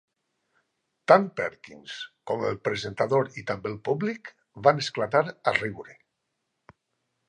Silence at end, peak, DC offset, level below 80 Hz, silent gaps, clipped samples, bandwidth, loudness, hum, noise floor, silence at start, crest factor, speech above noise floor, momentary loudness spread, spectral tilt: 1.35 s; -2 dBFS; under 0.1%; -66 dBFS; none; under 0.1%; 10 kHz; -26 LUFS; none; -80 dBFS; 1.1 s; 26 dB; 54 dB; 18 LU; -5.5 dB/octave